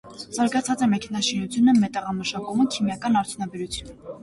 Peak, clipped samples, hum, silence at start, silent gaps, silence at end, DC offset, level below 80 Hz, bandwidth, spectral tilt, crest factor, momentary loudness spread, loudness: -10 dBFS; under 0.1%; none; 0.05 s; none; 0 s; under 0.1%; -54 dBFS; 11.5 kHz; -4.5 dB/octave; 14 dB; 13 LU; -23 LUFS